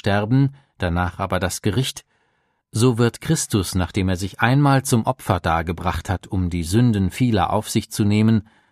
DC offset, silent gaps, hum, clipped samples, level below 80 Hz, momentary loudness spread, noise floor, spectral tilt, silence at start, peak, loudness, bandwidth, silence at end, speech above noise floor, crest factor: under 0.1%; none; none; under 0.1%; -40 dBFS; 7 LU; -67 dBFS; -5.5 dB/octave; 0.05 s; 0 dBFS; -20 LUFS; 15 kHz; 0.3 s; 48 dB; 20 dB